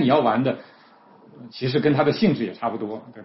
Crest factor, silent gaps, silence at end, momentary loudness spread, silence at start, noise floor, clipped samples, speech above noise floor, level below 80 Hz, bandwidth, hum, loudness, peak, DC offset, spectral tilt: 16 dB; none; 0 s; 13 LU; 0 s; -52 dBFS; under 0.1%; 30 dB; -60 dBFS; 5.8 kHz; none; -22 LUFS; -6 dBFS; under 0.1%; -10 dB/octave